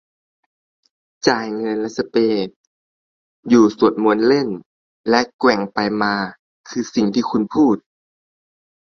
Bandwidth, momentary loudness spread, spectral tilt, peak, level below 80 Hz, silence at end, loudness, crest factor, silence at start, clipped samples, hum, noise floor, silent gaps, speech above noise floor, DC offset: 7.2 kHz; 12 LU; -5.5 dB/octave; 0 dBFS; -60 dBFS; 1.2 s; -18 LUFS; 18 dB; 1.25 s; under 0.1%; none; under -90 dBFS; 2.56-3.43 s, 4.66-5.04 s, 5.34-5.39 s, 6.39-6.64 s; over 73 dB; under 0.1%